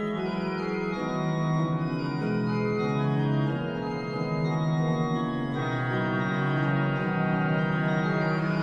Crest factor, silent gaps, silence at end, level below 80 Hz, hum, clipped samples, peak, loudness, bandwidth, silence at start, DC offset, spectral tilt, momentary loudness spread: 12 dB; none; 0 s; -54 dBFS; none; under 0.1%; -14 dBFS; -27 LUFS; 6.8 kHz; 0 s; under 0.1%; -8 dB/octave; 4 LU